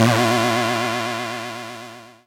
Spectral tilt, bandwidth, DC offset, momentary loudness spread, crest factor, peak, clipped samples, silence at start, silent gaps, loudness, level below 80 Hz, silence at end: -4.5 dB/octave; 17 kHz; under 0.1%; 17 LU; 20 dB; 0 dBFS; under 0.1%; 0 s; none; -21 LUFS; -62 dBFS; 0.15 s